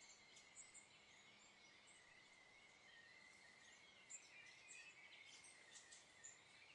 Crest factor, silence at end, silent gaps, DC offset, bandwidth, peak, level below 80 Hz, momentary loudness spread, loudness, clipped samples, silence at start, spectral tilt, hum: 20 dB; 0 s; none; under 0.1%; 11 kHz; -46 dBFS; under -90 dBFS; 7 LU; -63 LUFS; under 0.1%; 0 s; 0 dB/octave; none